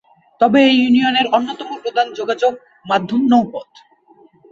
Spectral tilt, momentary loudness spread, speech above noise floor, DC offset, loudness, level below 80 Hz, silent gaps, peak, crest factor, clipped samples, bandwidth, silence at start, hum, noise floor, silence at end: -5.5 dB/octave; 14 LU; 35 dB; under 0.1%; -16 LUFS; -60 dBFS; none; -2 dBFS; 16 dB; under 0.1%; 7.4 kHz; 0.4 s; none; -50 dBFS; 0.9 s